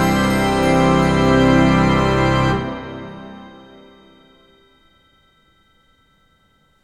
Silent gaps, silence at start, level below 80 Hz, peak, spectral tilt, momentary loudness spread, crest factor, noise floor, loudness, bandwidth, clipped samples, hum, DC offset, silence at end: none; 0 s; -34 dBFS; -2 dBFS; -6.5 dB/octave; 21 LU; 18 dB; -59 dBFS; -15 LUFS; 14 kHz; under 0.1%; none; under 0.1%; 3.35 s